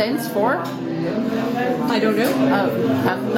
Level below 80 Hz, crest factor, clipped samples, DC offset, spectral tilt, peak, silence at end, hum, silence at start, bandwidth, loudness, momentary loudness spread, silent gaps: -58 dBFS; 16 dB; under 0.1%; under 0.1%; -6 dB/octave; -4 dBFS; 0 s; none; 0 s; 17 kHz; -20 LUFS; 6 LU; none